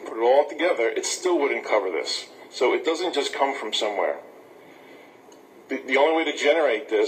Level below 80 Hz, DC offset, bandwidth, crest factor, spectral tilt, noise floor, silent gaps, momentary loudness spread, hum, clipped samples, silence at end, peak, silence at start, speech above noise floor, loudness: -86 dBFS; under 0.1%; 15.5 kHz; 18 dB; -1 dB/octave; -49 dBFS; none; 8 LU; none; under 0.1%; 0 s; -6 dBFS; 0 s; 26 dB; -23 LUFS